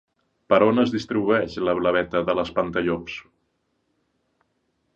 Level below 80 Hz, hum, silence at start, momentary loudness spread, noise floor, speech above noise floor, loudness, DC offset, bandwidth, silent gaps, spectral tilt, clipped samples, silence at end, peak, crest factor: -54 dBFS; none; 0.5 s; 8 LU; -72 dBFS; 50 dB; -22 LUFS; under 0.1%; 7.8 kHz; none; -6.5 dB/octave; under 0.1%; 1.75 s; -4 dBFS; 20 dB